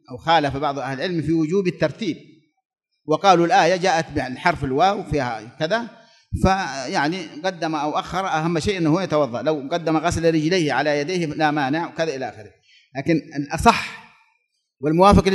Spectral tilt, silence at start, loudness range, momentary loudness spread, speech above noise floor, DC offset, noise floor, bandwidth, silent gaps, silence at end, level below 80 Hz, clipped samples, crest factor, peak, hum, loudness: -5.5 dB/octave; 0.1 s; 4 LU; 11 LU; 50 dB; under 0.1%; -70 dBFS; 12 kHz; 2.65-2.70 s; 0 s; -40 dBFS; under 0.1%; 20 dB; 0 dBFS; none; -21 LUFS